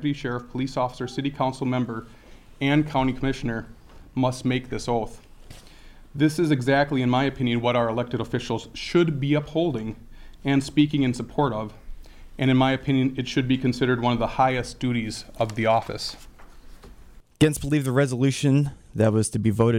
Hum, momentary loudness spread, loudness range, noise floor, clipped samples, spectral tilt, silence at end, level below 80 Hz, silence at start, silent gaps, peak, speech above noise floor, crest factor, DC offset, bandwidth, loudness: none; 10 LU; 3 LU; -47 dBFS; under 0.1%; -6 dB/octave; 0 s; -44 dBFS; 0 s; none; -6 dBFS; 24 dB; 18 dB; under 0.1%; 15.5 kHz; -24 LUFS